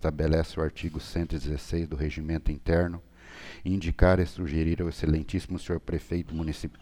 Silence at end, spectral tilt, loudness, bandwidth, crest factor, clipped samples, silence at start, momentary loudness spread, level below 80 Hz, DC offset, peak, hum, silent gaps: 0 s; -7.5 dB/octave; -29 LUFS; 13 kHz; 22 dB; under 0.1%; 0 s; 9 LU; -34 dBFS; under 0.1%; -6 dBFS; none; none